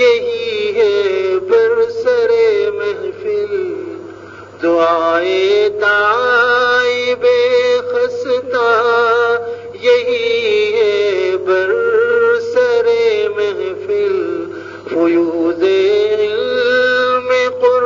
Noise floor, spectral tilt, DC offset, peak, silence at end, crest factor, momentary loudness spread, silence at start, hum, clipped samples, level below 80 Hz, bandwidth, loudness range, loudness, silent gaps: -34 dBFS; -4 dB/octave; under 0.1%; 0 dBFS; 0 s; 14 dB; 8 LU; 0 s; none; under 0.1%; -62 dBFS; 7.6 kHz; 3 LU; -14 LUFS; none